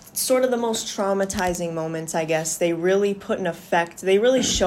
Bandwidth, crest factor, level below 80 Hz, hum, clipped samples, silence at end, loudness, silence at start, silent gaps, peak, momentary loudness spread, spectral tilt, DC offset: 16 kHz; 14 dB; -46 dBFS; none; under 0.1%; 0 s; -22 LUFS; 0.05 s; none; -8 dBFS; 7 LU; -3.5 dB/octave; under 0.1%